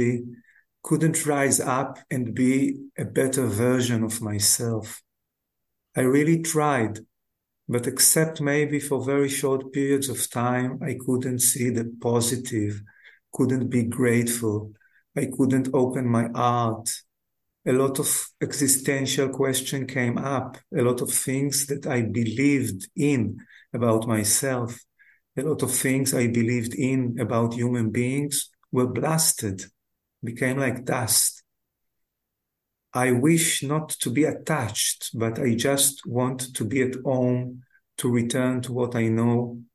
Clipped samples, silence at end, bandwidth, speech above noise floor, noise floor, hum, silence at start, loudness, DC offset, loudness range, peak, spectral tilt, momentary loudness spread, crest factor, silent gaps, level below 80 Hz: under 0.1%; 0.1 s; 13 kHz; 58 dB; -82 dBFS; none; 0 s; -24 LUFS; under 0.1%; 3 LU; -4 dBFS; -4.5 dB/octave; 10 LU; 20 dB; none; -60 dBFS